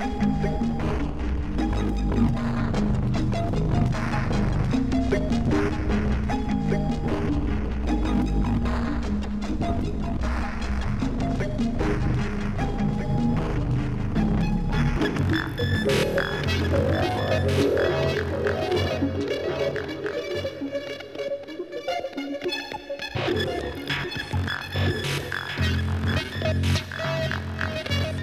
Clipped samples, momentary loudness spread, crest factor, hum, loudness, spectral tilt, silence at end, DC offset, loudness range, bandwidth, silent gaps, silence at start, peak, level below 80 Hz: under 0.1%; 6 LU; 14 dB; none; -26 LUFS; -6.5 dB/octave; 0 s; 0.1%; 5 LU; 14.5 kHz; none; 0 s; -10 dBFS; -32 dBFS